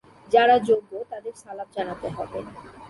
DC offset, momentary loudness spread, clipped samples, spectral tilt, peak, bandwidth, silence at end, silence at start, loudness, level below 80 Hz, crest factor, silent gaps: under 0.1%; 19 LU; under 0.1%; -5 dB/octave; -6 dBFS; 11.5 kHz; 0 s; 0.3 s; -23 LUFS; -58 dBFS; 20 dB; none